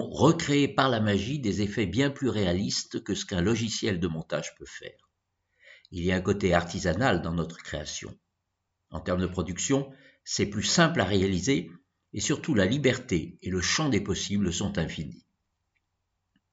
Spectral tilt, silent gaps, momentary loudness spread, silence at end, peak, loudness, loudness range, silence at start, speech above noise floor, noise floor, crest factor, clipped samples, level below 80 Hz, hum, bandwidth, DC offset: -4.5 dB/octave; none; 14 LU; 1.35 s; -6 dBFS; -27 LUFS; 5 LU; 0 s; 54 dB; -81 dBFS; 22 dB; under 0.1%; -52 dBFS; none; 8 kHz; under 0.1%